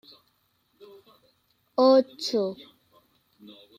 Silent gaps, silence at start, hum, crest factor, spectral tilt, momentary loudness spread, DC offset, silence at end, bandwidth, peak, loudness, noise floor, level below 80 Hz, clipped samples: none; 1.8 s; none; 20 dB; -5 dB/octave; 13 LU; under 0.1%; 1.25 s; 14.5 kHz; -8 dBFS; -24 LUFS; -70 dBFS; -78 dBFS; under 0.1%